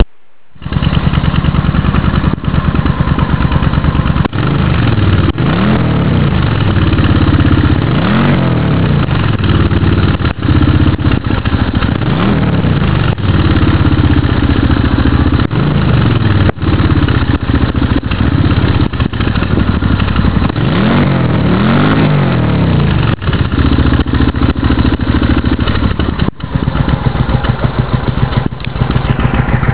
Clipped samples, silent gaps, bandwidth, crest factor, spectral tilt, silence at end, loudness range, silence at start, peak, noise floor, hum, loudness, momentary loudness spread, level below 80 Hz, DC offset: under 0.1%; none; 4 kHz; 10 dB; -11.5 dB/octave; 0 s; 2 LU; 0 s; 0 dBFS; -53 dBFS; none; -12 LUFS; 4 LU; -18 dBFS; 5%